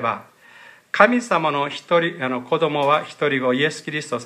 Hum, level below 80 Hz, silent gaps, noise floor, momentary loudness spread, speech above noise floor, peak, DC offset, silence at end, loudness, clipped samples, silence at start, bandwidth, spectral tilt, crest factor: none; -74 dBFS; none; -47 dBFS; 10 LU; 27 dB; 0 dBFS; under 0.1%; 0 s; -20 LUFS; under 0.1%; 0 s; 12 kHz; -5 dB/octave; 20 dB